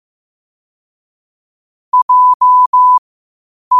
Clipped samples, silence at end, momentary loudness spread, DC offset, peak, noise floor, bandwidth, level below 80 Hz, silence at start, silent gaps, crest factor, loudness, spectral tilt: under 0.1%; 0 s; 6 LU; under 0.1%; -4 dBFS; under -90 dBFS; 1.4 kHz; -68 dBFS; 1.95 s; 2.02-2.09 s, 2.34-2.40 s, 2.66-2.73 s, 2.98-3.71 s; 10 dB; -9 LUFS; -1 dB/octave